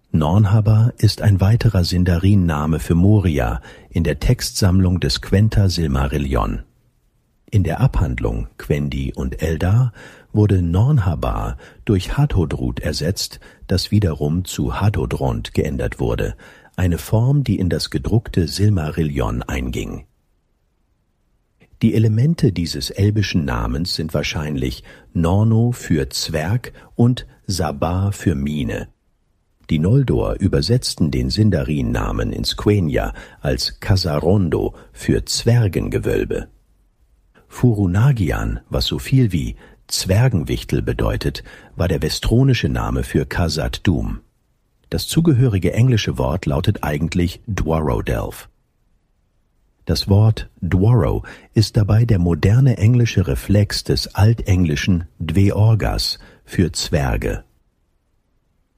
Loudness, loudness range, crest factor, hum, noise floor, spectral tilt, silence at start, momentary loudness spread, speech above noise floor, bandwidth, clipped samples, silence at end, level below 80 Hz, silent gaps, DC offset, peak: -18 LUFS; 5 LU; 14 dB; none; -64 dBFS; -6.5 dB/octave; 0.15 s; 9 LU; 46 dB; 15.5 kHz; under 0.1%; 1.35 s; -30 dBFS; none; under 0.1%; -4 dBFS